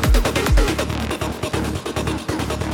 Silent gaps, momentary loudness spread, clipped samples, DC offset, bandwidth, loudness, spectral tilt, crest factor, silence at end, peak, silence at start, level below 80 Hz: none; 6 LU; under 0.1%; under 0.1%; 18.5 kHz; -22 LUFS; -5 dB/octave; 16 dB; 0 s; -4 dBFS; 0 s; -22 dBFS